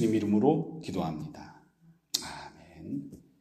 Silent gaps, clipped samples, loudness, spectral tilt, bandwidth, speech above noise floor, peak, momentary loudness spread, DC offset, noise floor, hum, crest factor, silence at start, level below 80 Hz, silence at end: none; under 0.1%; -31 LUFS; -5.5 dB/octave; 15 kHz; 31 dB; -12 dBFS; 23 LU; under 0.1%; -62 dBFS; none; 20 dB; 0 s; -62 dBFS; 0.25 s